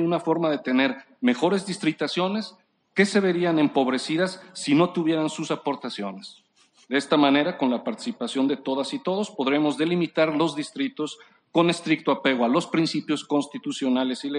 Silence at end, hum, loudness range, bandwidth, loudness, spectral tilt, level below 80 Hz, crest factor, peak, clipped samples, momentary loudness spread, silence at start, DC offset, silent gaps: 0 s; none; 2 LU; 10.5 kHz; -24 LUFS; -5 dB/octave; -74 dBFS; 18 dB; -6 dBFS; under 0.1%; 9 LU; 0 s; under 0.1%; none